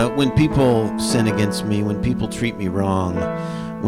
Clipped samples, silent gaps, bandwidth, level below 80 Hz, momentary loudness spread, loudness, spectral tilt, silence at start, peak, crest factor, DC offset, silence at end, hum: under 0.1%; none; 16 kHz; -38 dBFS; 7 LU; -20 LUFS; -6 dB/octave; 0 s; -8 dBFS; 12 dB; under 0.1%; 0 s; none